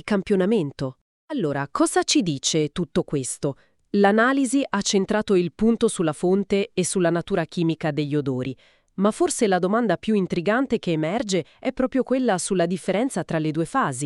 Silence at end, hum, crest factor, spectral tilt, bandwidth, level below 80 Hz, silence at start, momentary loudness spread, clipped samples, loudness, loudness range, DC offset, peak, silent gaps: 0 s; none; 18 dB; -5 dB/octave; 12 kHz; -52 dBFS; 0.05 s; 7 LU; under 0.1%; -23 LUFS; 2 LU; under 0.1%; -4 dBFS; 1.01-1.28 s